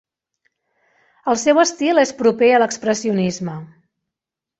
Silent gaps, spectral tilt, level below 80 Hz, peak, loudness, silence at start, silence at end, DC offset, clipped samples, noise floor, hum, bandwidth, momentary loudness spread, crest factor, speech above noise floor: none; -4.5 dB/octave; -62 dBFS; -2 dBFS; -17 LUFS; 1.25 s; 0.95 s; under 0.1%; under 0.1%; -86 dBFS; none; 8.2 kHz; 13 LU; 18 dB; 69 dB